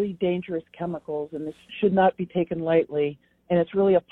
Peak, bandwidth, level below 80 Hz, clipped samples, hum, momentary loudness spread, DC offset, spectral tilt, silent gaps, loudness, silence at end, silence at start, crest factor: -8 dBFS; 4.1 kHz; -60 dBFS; under 0.1%; none; 12 LU; under 0.1%; -9.5 dB/octave; none; -25 LUFS; 0.1 s; 0 s; 16 dB